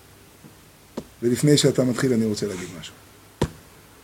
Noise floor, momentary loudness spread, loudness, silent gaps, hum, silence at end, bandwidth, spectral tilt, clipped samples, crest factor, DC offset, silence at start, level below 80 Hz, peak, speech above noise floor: -50 dBFS; 21 LU; -22 LUFS; none; none; 0.45 s; 17 kHz; -5 dB/octave; under 0.1%; 20 dB; under 0.1%; 0.45 s; -48 dBFS; -4 dBFS; 29 dB